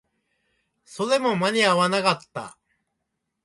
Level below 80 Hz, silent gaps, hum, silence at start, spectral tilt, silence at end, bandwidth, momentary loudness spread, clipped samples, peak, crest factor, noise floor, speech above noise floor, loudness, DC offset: -70 dBFS; none; none; 0.9 s; -4 dB/octave; 0.95 s; 11.5 kHz; 17 LU; under 0.1%; -6 dBFS; 20 dB; -79 dBFS; 57 dB; -22 LUFS; under 0.1%